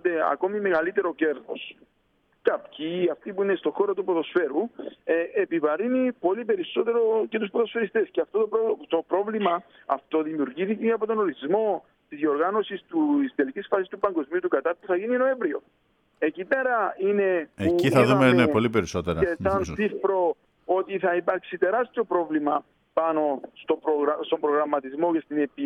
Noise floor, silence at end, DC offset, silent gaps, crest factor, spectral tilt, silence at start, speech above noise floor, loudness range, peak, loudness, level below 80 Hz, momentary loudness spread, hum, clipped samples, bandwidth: -68 dBFS; 0 s; under 0.1%; none; 20 dB; -6.5 dB/octave; 0.05 s; 43 dB; 5 LU; -6 dBFS; -25 LUFS; -56 dBFS; 6 LU; none; under 0.1%; 12.5 kHz